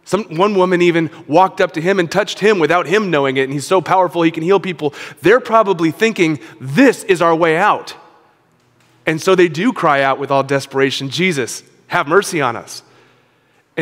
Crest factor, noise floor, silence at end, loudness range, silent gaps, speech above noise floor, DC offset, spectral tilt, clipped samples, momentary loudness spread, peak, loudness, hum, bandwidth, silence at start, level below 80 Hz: 16 dB; -56 dBFS; 0 s; 3 LU; none; 42 dB; under 0.1%; -5 dB/octave; under 0.1%; 9 LU; 0 dBFS; -15 LUFS; none; 16 kHz; 0.05 s; -60 dBFS